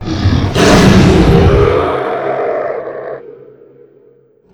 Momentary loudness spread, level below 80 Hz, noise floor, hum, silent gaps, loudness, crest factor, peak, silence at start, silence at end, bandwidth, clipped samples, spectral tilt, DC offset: 17 LU; -22 dBFS; -47 dBFS; none; none; -10 LUFS; 12 dB; 0 dBFS; 0 s; 1.2 s; 18 kHz; 0.8%; -6 dB/octave; under 0.1%